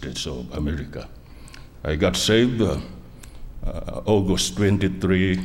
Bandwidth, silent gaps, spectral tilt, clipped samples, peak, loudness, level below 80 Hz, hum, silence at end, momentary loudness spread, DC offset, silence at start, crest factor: 16.5 kHz; none; -5 dB/octave; under 0.1%; -6 dBFS; -22 LUFS; -36 dBFS; none; 0 s; 22 LU; under 0.1%; 0 s; 18 dB